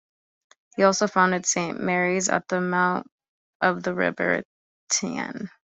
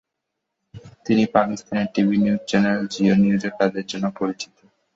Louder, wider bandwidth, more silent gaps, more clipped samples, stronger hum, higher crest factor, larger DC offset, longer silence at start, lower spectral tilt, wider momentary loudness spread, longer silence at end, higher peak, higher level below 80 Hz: second, -24 LUFS vs -21 LUFS; about the same, 8.2 kHz vs 7.8 kHz; first, 3.12-3.18 s, 3.28-3.60 s, 4.45-4.87 s vs none; neither; neither; about the same, 20 dB vs 20 dB; neither; about the same, 0.75 s vs 0.75 s; second, -3.5 dB/octave vs -6.5 dB/octave; about the same, 10 LU vs 9 LU; second, 0.3 s vs 0.5 s; about the same, -4 dBFS vs -2 dBFS; second, -66 dBFS vs -58 dBFS